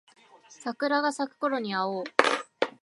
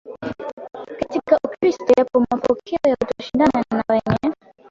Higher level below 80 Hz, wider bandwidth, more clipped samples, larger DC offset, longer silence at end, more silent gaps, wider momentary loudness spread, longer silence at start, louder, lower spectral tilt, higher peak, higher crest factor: second, -82 dBFS vs -50 dBFS; first, 11.5 kHz vs 7.6 kHz; neither; neither; second, 0.15 s vs 0.35 s; second, none vs 0.53-0.57 s; second, 8 LU vs 16 LU; first, 0.5 s vs 0.05 s; second, -28 LUFS vs -20 LUFS; second, -3.5 dB/octave vs -7 dB/octave; about the same, -2 dBFS vs -2 dBFS; first, 28 dB vs 18 dB